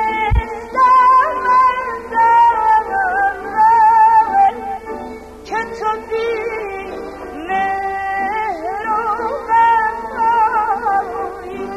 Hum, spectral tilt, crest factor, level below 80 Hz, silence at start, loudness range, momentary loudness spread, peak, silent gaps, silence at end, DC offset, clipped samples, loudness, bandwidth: none; -5.5 dB/octave; 12 dB; -34 dBFS; 0 s; 8 LU; 16 LU; -2 dBFS; none; 0 s; under 0.1%; under 0.1%; -15 LUFS; 12.5 kHz